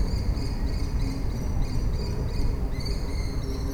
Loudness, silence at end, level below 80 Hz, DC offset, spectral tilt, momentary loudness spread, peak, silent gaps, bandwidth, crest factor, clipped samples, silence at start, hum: -30 LUFS; 0 s; -28 dBFS; under 0.1%; -6.5 dB/octave; 2 LU; -14 dBFS; none; 16.5 kHz; 12 dB; under 0.1%; 0 s; none